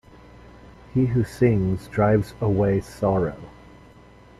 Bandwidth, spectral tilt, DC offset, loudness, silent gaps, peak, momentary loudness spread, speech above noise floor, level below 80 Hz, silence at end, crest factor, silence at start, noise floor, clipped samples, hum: 12.5 kHz; -9 dB/octave; under 0.1%; -23 LUFS; none; -8 dBFS; 6 LU; 27 dB; -44 dBFS; 0.9 s; 16 dB; 0.95 s; -49 dBFS; under 0.1%; none